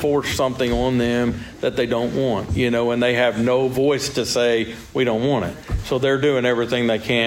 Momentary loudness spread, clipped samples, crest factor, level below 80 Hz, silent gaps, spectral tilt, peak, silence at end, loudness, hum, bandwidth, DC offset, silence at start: 6 LU; under 0.1%; 14 dB; -38 dBFS; none; -5 dB/octave; -6 dBFS; 0 s; -20 LUFS; none; 16.5 kHz; under 0.1%; 0 s